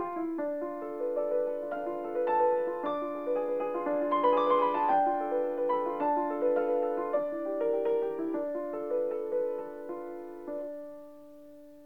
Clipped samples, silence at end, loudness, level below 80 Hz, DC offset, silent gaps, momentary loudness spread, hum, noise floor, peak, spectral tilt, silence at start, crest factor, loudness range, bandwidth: under 0.1%; 0 s; -31 LUFS; -74 dBFS; 0.2%; none; 13 LU; none; -52 dBFS; -14 dBFS; -7 dB/octave; 0 s; 16 dB; 6 LU; 4.7 kHz